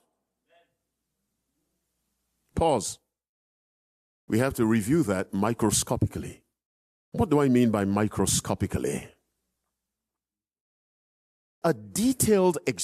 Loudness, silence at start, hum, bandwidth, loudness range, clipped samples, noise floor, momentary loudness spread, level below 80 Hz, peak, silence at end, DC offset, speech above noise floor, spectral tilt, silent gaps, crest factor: -25 LUFS; 2.55 s; none; 15 kHz; 8 LU; under 0.1%; under -90 dBFS; 12 LU; -52 dBFS; -10 dBFS; 0 s; under 0.1%; over 65 dB; -5 dB/octave; 3.29-4.28 s, 6.65-7.12 s, 10.61-11.62 s; 18 dB